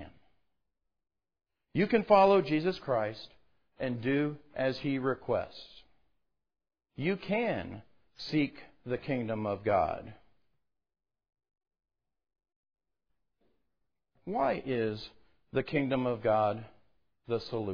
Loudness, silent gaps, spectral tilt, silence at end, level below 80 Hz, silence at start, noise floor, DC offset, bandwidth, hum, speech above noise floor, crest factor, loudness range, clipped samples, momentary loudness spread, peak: -31 LUFS; 12.56-12.63 s; -5 dB/octave; 0 s; -62 dBFS; 0 s; -86 dBFS; under 0.1%; 5.4 kHz; none; 56 dB; 24 dB; 9 LU; under 0.1%; 17 LU; -10 dBFS